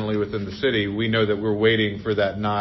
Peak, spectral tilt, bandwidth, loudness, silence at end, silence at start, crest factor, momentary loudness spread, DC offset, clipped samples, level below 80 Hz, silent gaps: -6 dBFS; -7.5 dB/octave; 6 kHz; -22 LUFS; 0 s; 0 s; 16 dB; 5 LU; under 0.1%; under 0.1%; -48 dBFS; none